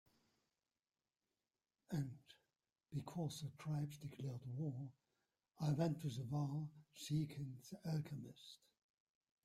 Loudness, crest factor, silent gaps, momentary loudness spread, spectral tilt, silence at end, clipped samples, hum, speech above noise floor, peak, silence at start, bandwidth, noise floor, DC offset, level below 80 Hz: -46 LUFS; 20 dB; none; 12 LU; -7 dB/octave; 0.9 s; under 0.1%; none; over 45 dB; -26 dBFS; 1.9 s; 14.5 kHz; under -90 dBFS; under 0.1%; -78 dBFS